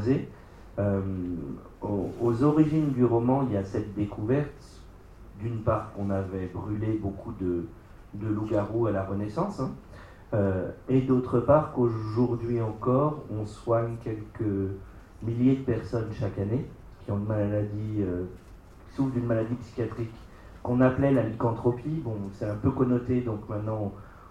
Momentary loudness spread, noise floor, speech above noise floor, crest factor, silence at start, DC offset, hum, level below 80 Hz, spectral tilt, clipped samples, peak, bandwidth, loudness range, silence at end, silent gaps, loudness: 13 LU; -48 dBFS; 21 dB; 20 dB; 0 s; under 0.1%; none; -50 dBFS; -9.5 dB/octave; under 0.1%; -8 dBFS; 9.6 kHz; 5 LU; 0 s; none; -28 LUFS